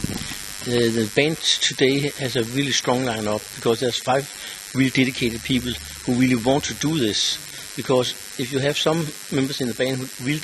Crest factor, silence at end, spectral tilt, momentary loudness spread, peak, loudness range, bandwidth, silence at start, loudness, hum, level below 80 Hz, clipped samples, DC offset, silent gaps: 20 dB; 0 s; -4 dB/octave; 10 LU; -2 dBFS; 2 LU; 13 kHz; 0 s; -22 LUFS; none; -50 dBFS; under 0.1%; under 0.1%; none